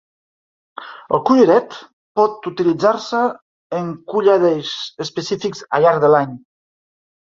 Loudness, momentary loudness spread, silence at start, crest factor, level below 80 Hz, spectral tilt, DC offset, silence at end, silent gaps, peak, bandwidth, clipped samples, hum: -17 LUFS; 14 LU; 0.8 s; 18 dB; -62 dBFS; -6 dB/octave; under 0.1%; 1 s; 1.93-2.15 s, 3.42-3.70 s; 0 dBFS; 7.6 kHz; under 0.1%; none